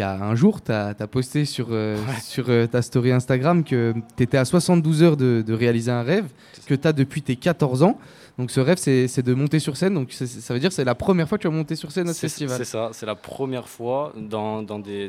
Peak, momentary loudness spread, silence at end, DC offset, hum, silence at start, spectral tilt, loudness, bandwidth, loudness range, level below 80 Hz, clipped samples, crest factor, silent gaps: -4 dBFS; 10 LU; 0 s; under 0.1%; none; 0 s; -6.5 dB/octave; -22 LUFS; 15.5 kHz; 5 LU; -56 dBFS; under 0.1%; 18 dB; none